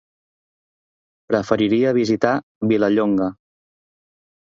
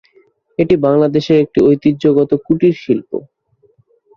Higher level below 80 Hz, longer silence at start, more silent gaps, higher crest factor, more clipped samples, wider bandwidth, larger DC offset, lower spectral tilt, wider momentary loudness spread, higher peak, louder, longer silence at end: second, -58 dBFS vs -48 dBFS; first, 1.3 s vs 0.6 s; first, 2.43-2.61 s vs none; first, 20 dB vs 12 dB; neither; about the same, 7.6 kHz vs 7 kHz; neither; second, -7 dB/octave vs -8.5 dB/octave; about the same, 6 LU vs 8 LU; about the same, -2 dBFS vs -2 dBFS; second, -19 LUFS vs -13 LUFS; first, 1.15 s vs 1 s